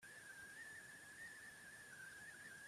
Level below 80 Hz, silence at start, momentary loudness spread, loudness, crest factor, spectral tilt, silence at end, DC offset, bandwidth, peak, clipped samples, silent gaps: -86 dBFS; 0 s; 2 LU; -56 LUFS; 12 dB; -1.5 dB/octave; 0 s; under 0.1%; 14.5 kHz; -46 dBFS; under 0.1%; none